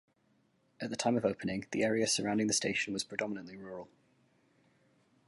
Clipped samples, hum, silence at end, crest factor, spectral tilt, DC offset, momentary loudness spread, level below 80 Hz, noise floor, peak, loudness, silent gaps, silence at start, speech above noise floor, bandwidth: under 0.1%; none; 1.4 s; 22 dB; -3.5 dB/octave; under 0.1%; 15 LU; -70 dBFS; -73 dBFS; -14 dBFS; -33 LUFS; none; 0.8 s; 39 dB; 11.5 kHz